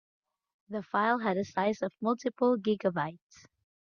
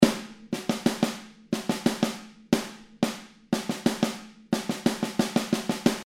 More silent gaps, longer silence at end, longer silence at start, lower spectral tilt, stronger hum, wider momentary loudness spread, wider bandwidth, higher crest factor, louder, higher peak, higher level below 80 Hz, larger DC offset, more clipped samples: neither; first, 0.75 s vs 0 s; first, 0.7 s vs 0 s; first, -6.5 dB/octave vs -4.5 dB/octave; neither; about the same, 9 LU vs 10 LU; second, 7 kHz vs 16.5 kHz; second, 18 dB vs 26 dB; second, -31 LUFS vs -28 LUFS; second, -14 dBFS vs -2 dBFS; second, -74 dBFS vs -58 dBFS; neither; neither